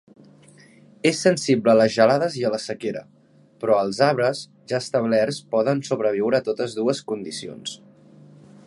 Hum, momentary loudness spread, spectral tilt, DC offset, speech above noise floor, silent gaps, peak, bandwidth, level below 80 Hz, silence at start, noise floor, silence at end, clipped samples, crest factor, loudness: 50 Hz at -55 dBFS; 14 LU; -5 dB/octave; under 0.1%; 29 dB; none; -2 dBFS; 11.5 kHz; -68 dBFS; 1.05 s; -51 dBFS; 0.9 s; under 0.1%; 20 dB; -22 LUFS